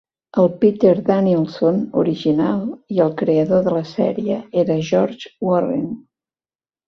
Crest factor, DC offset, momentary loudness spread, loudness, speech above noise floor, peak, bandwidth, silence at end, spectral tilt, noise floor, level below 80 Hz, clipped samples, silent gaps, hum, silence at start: 16 dB; under 0.1%; 9 LU; -18 LUFS; over 73 dB; -2 dBFS; 6.4 kHz; 0.9 s; -8.5 dB/octave; under -90 dBFS; -58 dBFS; under 0.1%; none; none; 0.35 s